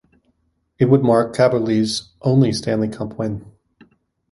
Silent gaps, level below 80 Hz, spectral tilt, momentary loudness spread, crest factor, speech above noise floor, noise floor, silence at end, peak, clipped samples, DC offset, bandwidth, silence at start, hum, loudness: none; -52 dBFS; -6.5 dB/octave; 11 LU; 18 dB; 49 dB; -66 dBFS; 0.85 s; -2 dBFS; under 0.1%; under 0.1%; 11.5 kHz; 0.8 s; none; -18 LUFS